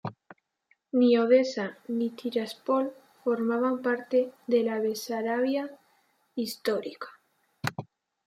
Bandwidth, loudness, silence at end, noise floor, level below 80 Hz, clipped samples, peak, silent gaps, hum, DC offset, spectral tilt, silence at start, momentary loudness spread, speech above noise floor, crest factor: 16 kHz; -28 LUFS; 0.45 s; -71 dBFS; -78 dBFS; under 0.1%; -10 dBFS; none; none; under 0.1%; -5.5 dB/octave; 0.05 s; 14 LU; 44 dB; 18 dB